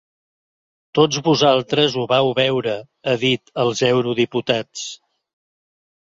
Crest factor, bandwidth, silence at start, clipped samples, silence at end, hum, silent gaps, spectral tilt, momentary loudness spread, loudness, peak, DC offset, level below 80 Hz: 18 dB; 7.8 kHz; 0.95 s; under 0.1%; 1.2 s; none; none; -4.5 dB/octave; 10 LU; -18 LUFS; -2 dBFS; under 0.1%; -60 dBFS